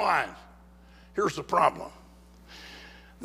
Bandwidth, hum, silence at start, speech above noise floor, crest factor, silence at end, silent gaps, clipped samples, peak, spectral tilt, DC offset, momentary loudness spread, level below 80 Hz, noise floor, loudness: 15.5 kHz; 60 Hz at -55 dBFS; 0 s; 26 dB; 22 dB; 0 s; none; under 0.1%; -8 dBFS; -4.5 dB/octave; under 0.1%; 25 LU; -56 dBFS; -53 dBFS; -28 LUFS